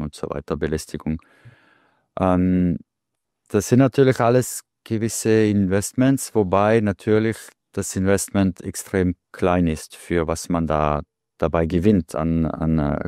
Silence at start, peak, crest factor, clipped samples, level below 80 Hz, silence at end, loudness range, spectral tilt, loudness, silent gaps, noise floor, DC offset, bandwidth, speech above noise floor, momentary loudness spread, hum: 0 s; -4 dBFS; 18 dB; under 0.1%; -40 dBFS; 0 s; 4 LU; -6.5 dB/octave; -21 LUFS; none; -81 dBFS; under 0.1%; 16 kHz; 61 dB; 11 LU; none